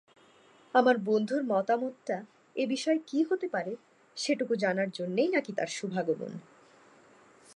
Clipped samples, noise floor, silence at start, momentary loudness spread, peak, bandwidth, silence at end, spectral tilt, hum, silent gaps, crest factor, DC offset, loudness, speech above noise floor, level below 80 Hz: under 0.1%; -60 dBFS; 0.75 s; 12 LU; -10 dBFS; 11.5 kHz; 1.15 s; -5 dB/octave; none; none; 22 dB; under 0.1%; -30 LUFS; 31 dB; -86 dBFS